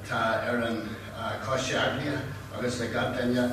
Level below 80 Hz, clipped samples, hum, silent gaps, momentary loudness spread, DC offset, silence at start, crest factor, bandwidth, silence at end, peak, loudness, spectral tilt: -52 dBFS; under 0.1%; none; none; 8 LU; under 0.1%; 0 s; 16 dB; 14 kHz; 0 s; -14 dBFS; -29 LUFS; -5 dB/octave